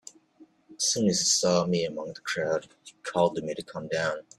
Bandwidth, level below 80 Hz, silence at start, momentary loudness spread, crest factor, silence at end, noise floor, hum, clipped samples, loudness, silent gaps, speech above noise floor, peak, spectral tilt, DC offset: 13.5 kHz; -66 dBFS; 0.4 s; 13 LU; 18 dB; 0.15 s; -58 dBFS; none; under 0.1%; -27 LUFS; none; 30 dB; -10 dBFS; -3 dB/octave; under 0.1%